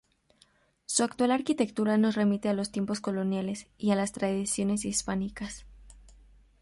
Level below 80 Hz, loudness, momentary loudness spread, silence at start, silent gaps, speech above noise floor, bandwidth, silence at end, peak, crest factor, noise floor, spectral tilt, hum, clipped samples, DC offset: -56 dBFS; -29 LUFS; 10 LU; 0.9 s; none; 37 dB; 11.5 kHz; 0.5 s; -12 dBFS; 18 dB; -66 dBFS; -4.5 dB/octave; none; under 0.1%; under 0.1%